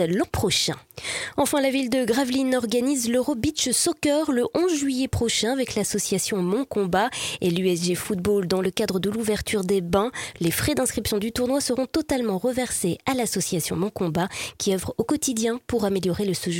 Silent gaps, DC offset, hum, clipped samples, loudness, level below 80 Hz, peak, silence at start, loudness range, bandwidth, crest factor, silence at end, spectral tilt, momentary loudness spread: none; under 0.1%; none; under 0.1%; -24 LUFS; -48 dBFS; -6 dBFS; 0 s; 2 LU; 17 kHz; 18 dB; 0 s; -4 dB/octave; 4 LU